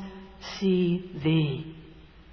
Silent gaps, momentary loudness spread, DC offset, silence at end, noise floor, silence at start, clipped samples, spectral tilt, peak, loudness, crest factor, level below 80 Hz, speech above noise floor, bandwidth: none; 18 LU; under 0.1%; 0 s; -49 dBFS; 0 s; under 0.1%; -7.5 dB/octave; -14 dBFS; -27 LUFS; 16 dB; -54 dBFS; 24 dB; 5.4 kHz